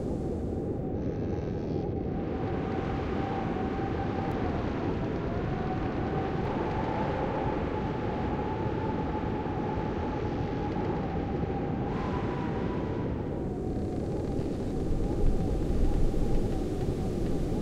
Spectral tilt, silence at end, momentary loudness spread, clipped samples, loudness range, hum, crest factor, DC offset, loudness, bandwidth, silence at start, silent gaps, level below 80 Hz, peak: -8.5 dB/octave; 0 s; 2 LU; under 0.1%; 1 LU; none; 16 dB; under 0.1%; -32 LUFS; 10 kHz; 0 s; none; -36 dBFS; -14 dBFS